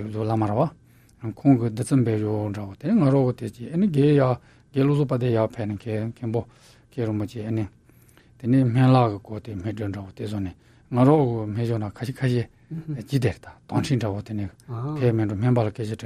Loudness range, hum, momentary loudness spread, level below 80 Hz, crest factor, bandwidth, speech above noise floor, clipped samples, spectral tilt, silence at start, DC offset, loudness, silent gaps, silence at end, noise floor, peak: 5 LU; none; 14 LU; -56 dBFS; 18 dB; 11.5 kHz; 31 dB; under 0.1%; -8.5 dB/octave; 0 s; under 0.1%; -24 LUFS; none; 0 s; -54 dBFS; -4 dBFS